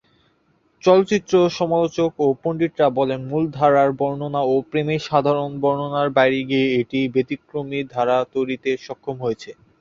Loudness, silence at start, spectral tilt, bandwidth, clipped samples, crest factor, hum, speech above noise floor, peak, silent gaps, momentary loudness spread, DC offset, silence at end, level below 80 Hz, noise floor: -20 LUFS; 0.85 s; -6.5 dB/octave; 7.4 kHz; under 0.1%; 18 dB; none; 43 dB; -2 dBFS; none; 10 LU; under 0.1%; 0.25 s; -58 dBFS; -62 dBFS